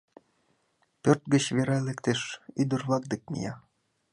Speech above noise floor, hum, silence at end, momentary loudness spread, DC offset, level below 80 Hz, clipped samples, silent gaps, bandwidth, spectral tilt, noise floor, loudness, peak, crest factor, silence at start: 44 dB; none; 0.55 s; 11 LU; under 0.1%; -66 dBFS; under 0.1%; none; 11.5 kHz; -5.5 dB/octave; -72 dBFS; -28 LUFS; -6 dBFS; 24 dB; 1.05 s